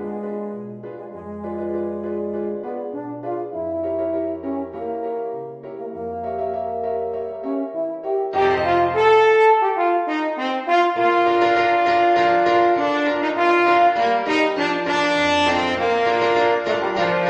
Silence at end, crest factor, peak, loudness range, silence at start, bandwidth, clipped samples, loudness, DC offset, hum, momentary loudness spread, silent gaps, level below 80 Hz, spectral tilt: 0 s; 16 dB; -4 dBFS; 10 LU; 0 s; 9 kHz; under 0.1%; -20 LUFS; under 0.1%; none; 14 LU; none; -56 dBFS; -5 dB/octave